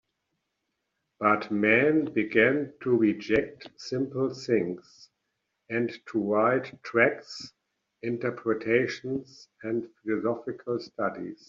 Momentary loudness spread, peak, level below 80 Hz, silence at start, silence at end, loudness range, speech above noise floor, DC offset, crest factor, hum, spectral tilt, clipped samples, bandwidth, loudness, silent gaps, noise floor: 13 LU; -8 dBFS; -66 dBFS; 1.2 s; 0.15 s; 6 LU; 53 dB; under 0.1%; 20 dB; none; -4.5 dB/octave; under 0.1%; 7.6 kHz; -27 LUFS; none; -81 dBFS